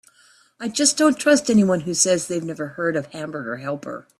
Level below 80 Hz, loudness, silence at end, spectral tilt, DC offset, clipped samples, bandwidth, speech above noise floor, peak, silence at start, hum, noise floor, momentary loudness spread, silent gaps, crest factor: -62 dBFS; -20 LUFS; 0.2 s; -3.5 dB/octave; under 0.1%; under 0.1%; 14 kHz; 35 dB; -2 dBFS; 0.6 s; none; -56 dBFS; 14 LU; none; 18 dB